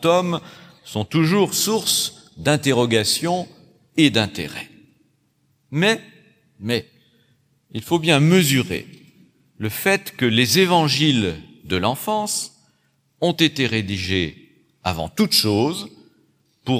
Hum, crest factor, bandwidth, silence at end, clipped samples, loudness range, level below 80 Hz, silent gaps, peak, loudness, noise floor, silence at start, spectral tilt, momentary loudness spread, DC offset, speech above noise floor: none; 20 dB; 16.5 kHz; 0 s; under 0.1%; 4 LU; -54 dBFS; none; -2 dBFS; -19 LUFS; -65 dBFS; 0 s; -4 dB/octave; 14 LU; under 0.1%; 45 dB